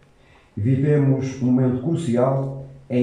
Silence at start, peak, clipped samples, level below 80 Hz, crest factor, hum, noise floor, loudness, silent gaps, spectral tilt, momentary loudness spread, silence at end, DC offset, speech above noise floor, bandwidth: 0.55 s; -6 dBFS; under 0.1%; -54 dBFS; 14 dB; none; -53 dBFS; -21 LUFS; none; -9 dB/octave; 11 LU; 0 s; under 0.1%; 34 dB; 9.8 kHz